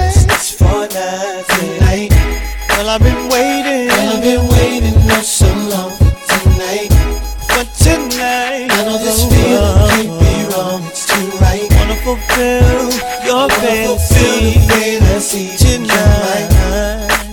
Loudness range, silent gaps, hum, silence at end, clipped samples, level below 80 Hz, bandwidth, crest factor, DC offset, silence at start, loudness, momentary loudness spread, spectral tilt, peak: 2 LU; none; none; 0 s; under 0.1%; -18 dBFS; 18 kHz; 12 dB; 0.2%; 0 s; -12 LUFS; 6 LU; -4.5 dB/octave; 0 dBFS